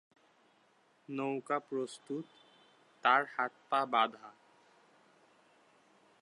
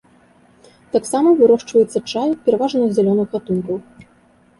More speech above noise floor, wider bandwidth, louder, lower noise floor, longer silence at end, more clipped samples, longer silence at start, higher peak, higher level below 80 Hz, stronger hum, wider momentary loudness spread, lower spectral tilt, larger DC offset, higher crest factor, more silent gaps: about the same, 35 dB vs 37 dB; about the same, 11 kHz vs 11.5 kHz; second, -34 LUFS vs -17 LUFS; first, -70 dBFS vs -53 dBFS; first, 1.9 s vs 0.8 s; neither; first, 1.1 s vs 0.95 s; second, -12 dBFS vs -2 dBFS; second, under -90 dBFS vs -58 dBFS; neither; first, 15 LU vs 9 LU; second, -4.5 dB/octave vs -6.5 dB/octave; neither; first, 26 dB vs 16 dB; neither